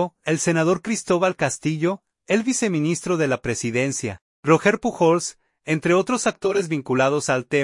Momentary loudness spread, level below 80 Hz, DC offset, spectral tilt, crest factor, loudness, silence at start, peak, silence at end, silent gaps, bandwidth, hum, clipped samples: 6 LU; -58 dBFS; under 0.1%; -5 dB/octave; 18 dB; -21 LUFS; 0 s; -4 dBFS; 0 s; 4.21-4.43 s; 11.5 kHz; none; under 0.1%